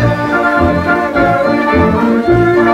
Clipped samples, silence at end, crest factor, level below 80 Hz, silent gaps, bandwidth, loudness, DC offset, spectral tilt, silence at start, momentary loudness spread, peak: under 0.1%; 0 s; 10 dB; -32 dBFS; none; 13 kHz; -11 LUFS; under 0.1%; -8 dB/octave; 0 s; 3 LU; 0 dBFS